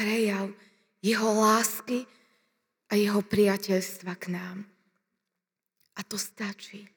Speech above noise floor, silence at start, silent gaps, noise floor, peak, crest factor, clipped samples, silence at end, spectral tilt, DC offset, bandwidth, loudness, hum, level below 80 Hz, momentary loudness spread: 59 dB; 0 s; none; -86 dBFS; -10 dBFS; 20 dB; under 0.1%; 0.1 s; -4 dB/octave; under 0.1%; over 20 kHz; -28 LUFS; none; -74 dBFS; 18 LU